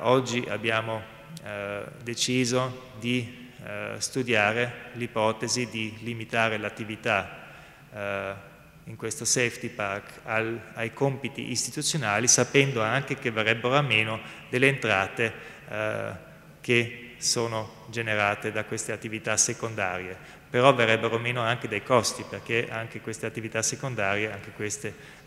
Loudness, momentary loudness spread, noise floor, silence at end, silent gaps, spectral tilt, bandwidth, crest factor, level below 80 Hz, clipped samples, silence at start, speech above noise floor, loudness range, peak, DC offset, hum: -27 LUFS; 14 LU; -48 dBFS; 0.05 s; none; -3 dB/octave; 16 kHz; 24 dB; -62 dBFS; under 0.1%; 0 s; 20 dB; 6 LU; -2 dBFS; under 0.1%; none